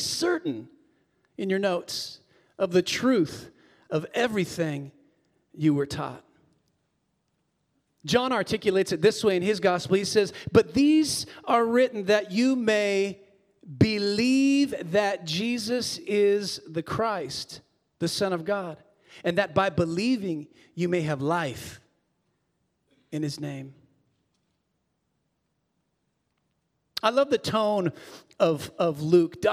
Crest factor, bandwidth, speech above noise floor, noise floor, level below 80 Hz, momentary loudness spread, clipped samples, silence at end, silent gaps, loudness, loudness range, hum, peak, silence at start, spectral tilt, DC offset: 20 dB; 16 kHz; 51 dB; -76 dBFS; -64 dBFS; 13 LU; under 0.1%; 0 s; none; -25 LUFS; 11 LU; none; -6 dBFS; 0 s; -5 dB/octave; under 0.1%